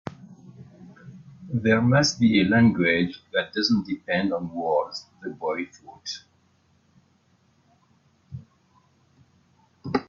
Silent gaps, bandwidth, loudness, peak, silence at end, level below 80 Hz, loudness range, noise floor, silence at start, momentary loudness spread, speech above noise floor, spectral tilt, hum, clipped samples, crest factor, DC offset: none; 7.4 kHz; -23 LUFS; -6 dBFS; 0.05 s; -62 dBFS; 17 LU; -64 dBFS; 0.05 s; 23 LU; 41 dB; -5.5 dB/octave; none; under 0.1%; 20 dB; under 0.1%